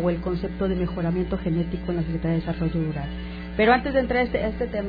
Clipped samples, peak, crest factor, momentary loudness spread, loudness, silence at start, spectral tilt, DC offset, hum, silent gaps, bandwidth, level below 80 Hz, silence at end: under 0.1%; -6 dBFS; 18 dB; 9 LU; -25 LUFS; 0 s; -10 dB/octave; under 0.1%; none; none; 5 kHz; -36 dBFS; 0 s